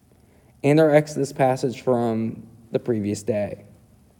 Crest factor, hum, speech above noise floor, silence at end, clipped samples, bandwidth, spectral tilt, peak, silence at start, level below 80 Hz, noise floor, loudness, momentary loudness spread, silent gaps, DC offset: 20 dB; none; 34 dB; 0.6 s; under 0.1%; 18 kHz; -7 dB/octave; -2 dBFS; 0.65 s; -62 dBFS; -55 dBFS; -22 LUFS; 13 LU; none; under 0.1%